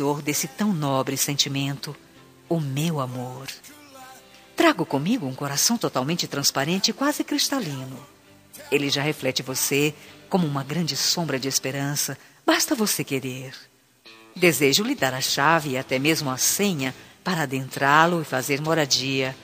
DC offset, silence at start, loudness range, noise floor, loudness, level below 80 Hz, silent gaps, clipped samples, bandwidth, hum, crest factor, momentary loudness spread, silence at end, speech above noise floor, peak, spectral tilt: under 0.1%; 0 s; 5 LU; -51 dBFS; -23 LUFS; -66 dBFS; none; under 0.1%; 15.5 kHz; none; 22 dB; 13 LU; 0 s; 27 dB; -2 dBFS; -3.5 dB/octave